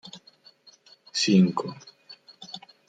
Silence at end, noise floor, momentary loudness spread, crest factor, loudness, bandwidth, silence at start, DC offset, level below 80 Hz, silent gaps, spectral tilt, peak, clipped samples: 0.3 s; -56 dBFS; 27 LU; 20 dB; -23 LUFS; 9.2 kHz; 0.05 s; under 0.1%; -72 dBFS; none; -5 dB/octave; -8 dBFS; under 0.1%